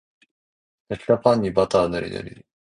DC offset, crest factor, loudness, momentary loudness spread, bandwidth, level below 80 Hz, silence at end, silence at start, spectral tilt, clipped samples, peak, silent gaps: under 0.1%; 22 dB; -21 LUFS; 16 LU; 10.5 kHz; -50 dBFS; 0.35 s; 0.9 s; -6.5 dB/octave; under 0.1%; -2 dBFS; none